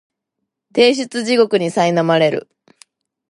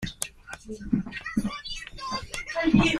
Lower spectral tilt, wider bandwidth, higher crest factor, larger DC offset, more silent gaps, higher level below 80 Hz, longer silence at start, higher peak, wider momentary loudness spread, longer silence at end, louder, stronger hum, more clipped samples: about the same, -5 dB/octave vs -4.5 dB/octave; second, 11.5 kHz vs 15 kHz; second, 16 dB vs 24 dB; neither; neither; second, -70 dBFS vs -44 dBFS; first, 0.75 s vs 0 s; first, 0 dBFS vs -4 dBFS; second, 7 LU vs 15 LU; first, 0.9 s vs 0 s; first, -16 LUFS vs -28 LUFS; neither; neither